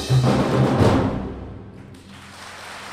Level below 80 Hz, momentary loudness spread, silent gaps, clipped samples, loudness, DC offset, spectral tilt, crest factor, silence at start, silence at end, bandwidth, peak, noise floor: -38 dBFS; 24 LU; none; under 0.1%; -19 LUFS; under 0.1%; -7 dB/octave; 18 dB; 0 s; 0 s; 14 kHz; -4 dBFS; -41 dBFS